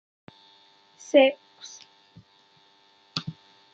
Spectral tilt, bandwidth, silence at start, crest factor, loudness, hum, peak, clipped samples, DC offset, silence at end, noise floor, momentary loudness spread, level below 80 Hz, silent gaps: -4.5 dB/octave; 7.8 kHz; 1.15 s; 24 dB; -23 LUFS; none; -6 dBFS; under 0.1%; under 0.1%; 0.45 s; -60 dBFS; 26 LU; -74 dBFS; none